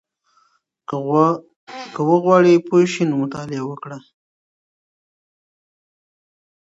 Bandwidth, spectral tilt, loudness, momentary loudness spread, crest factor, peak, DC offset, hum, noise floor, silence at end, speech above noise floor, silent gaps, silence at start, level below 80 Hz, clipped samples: 8 kHz; -7 dB/octave; -17 LUFS; 22 LU; 20 dB; 0 dBFS; under 0.1%; none; -63 dBFS; 2.65 s; 46 dB; 1.56-1.67 s; 0.9 s; -68 dBFS; under 0.1%